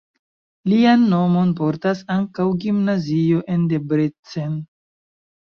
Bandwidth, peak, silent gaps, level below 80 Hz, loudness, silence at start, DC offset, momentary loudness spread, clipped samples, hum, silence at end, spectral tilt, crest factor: 6.8 kHz; -4 dBFS; 4.19-4.23 s; -60 dBFS; -19 LUFS; 0.65 s; under 0.1%; 12 LU; under 0.1%; none; 0.95 s; -8.5 dB/octave; 16 dB